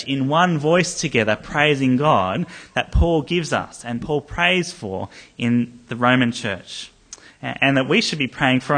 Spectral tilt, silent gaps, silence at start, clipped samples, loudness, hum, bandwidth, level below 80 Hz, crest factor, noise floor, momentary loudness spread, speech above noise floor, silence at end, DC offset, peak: -5 dB/octave; none; 0 s; under 0.1%; -20 LUFS; none; 10 kHz; -34 dBFS; 18 dB; -44 dBFS; 12 LU; 24 dB; 0 s; under 0.1%; -2 dBFS